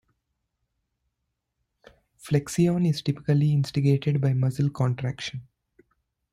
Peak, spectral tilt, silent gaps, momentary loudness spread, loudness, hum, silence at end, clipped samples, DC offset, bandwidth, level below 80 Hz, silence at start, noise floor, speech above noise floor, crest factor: -10 dBFS; -7 dB/octave; none; 8 LU; -25 LUFS; none; 0.9 s; under 0.1%; under 0.1%; 14 kHz; -58 dBFS; 2.25 s; -80 dBFS; 57 dB; 16 dB